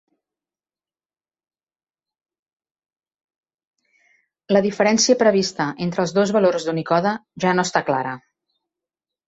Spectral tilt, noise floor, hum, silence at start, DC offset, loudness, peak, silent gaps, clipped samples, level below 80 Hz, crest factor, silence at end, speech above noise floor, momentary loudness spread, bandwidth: -4 dB/octave; under -90 dBFS; none; 4.5 s; under 0.1%; -19 LUFS; -2 dBFS; none; under 0.1%; -64 dBFS; 20 dB; 1.1 s; over 71 dB; 9 LU; 8.2 kHz